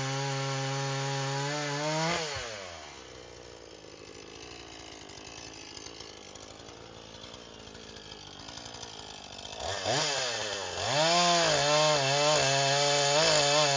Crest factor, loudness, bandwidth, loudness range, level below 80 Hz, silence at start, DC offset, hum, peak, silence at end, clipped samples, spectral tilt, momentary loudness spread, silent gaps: 20 dB; -27 LUFS; 7.8 kHz; 19 LU; -60 dBFS; 0 s; under 0.1%; none; -12 dBFS; 0 s; under 0.1%; -2.5 dB/octave; 23 LU; none